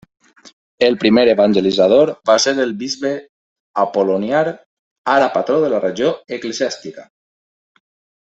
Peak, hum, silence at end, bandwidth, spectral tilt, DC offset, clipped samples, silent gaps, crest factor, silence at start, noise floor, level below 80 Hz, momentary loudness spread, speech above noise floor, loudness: 0 dBFS; none; 1.2 s; 8.2 kHz; -4 dB/octave; under 0.1%; under 0.1%; 3.29-3.74 s, 4.66-5.04 s; 16 dB; 0.8 s; under -90 dBFS; -58 dBFS; 13 LU; over 75 dB; -16 LUFS